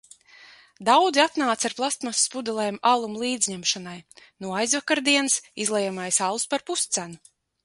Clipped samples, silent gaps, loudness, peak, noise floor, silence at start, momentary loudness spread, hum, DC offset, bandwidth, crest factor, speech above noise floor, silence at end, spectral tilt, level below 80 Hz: under 0.1%; none; -23 LUFS; -6 dBFS; -51 dBFS; 0.4 s; 9 LU; none; under 0.1%; 12 kHz; 20 dB; 27 dB; 0.5 s; -1.5 dB/octave; -72 dBFS